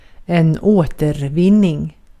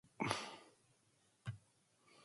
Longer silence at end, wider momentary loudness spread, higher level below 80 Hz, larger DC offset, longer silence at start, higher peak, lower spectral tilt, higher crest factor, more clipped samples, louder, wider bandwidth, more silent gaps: first, 0.3 s vs 0 s; second, 8 LU vs 17 LU; first, -38 dBFS vs -76 dBFS; neither; about the same, 0.3 s vs 0.2 s; first, -2 dBFS vs -18 dBFS; first, -8.5 dB/octave vs -4 dB/octave; second, 14 dB vs 32 dB; neither; first, -15 LUFS vs -46 LUFS; first, 13 kHz vs 11.5 kHz; neither